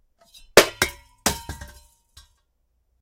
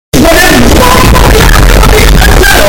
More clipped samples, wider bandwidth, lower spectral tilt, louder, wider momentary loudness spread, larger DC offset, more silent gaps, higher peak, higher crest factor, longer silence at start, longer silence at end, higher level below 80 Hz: second, under 0.1% vs 10%; second, 16.5 kHz vs over 20 kHz; second, -2 dB/octave vs -4 dB/octave; second, -20 LUFS vs -3 LUFS; first, 21 LU vs 1 LU; neither; neither; about the same, 0 dBFS vs 0 dBFS; first, 26 dB vs 2 dB; first, 0.55 s vs 0.15 s; first, 1.35 s vs 0 s; second, -46 dBFS vs -6 dBFS